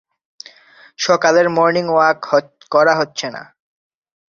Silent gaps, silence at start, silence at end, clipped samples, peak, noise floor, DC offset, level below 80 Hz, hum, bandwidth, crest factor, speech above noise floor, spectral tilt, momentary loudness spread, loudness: none; 1 s; 0.9 s; under 0.1%; 0 dBFS; -47 dBFS; under 0.1%; -62 dBFS; none; 7.4 kHz; 18 dB; 32 dB; -4 dB/octave; 11 LU; -15 LUFS